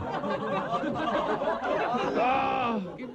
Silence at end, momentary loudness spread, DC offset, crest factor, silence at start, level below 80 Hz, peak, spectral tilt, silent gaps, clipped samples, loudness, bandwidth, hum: 0 s; 5 LU; under 0.1%; 12 dB; 0 s; -58 dBFS; -16 dBFS; -6 dB/octave; none; under 0.1%; -28 LUFS; 9.2 kHz; none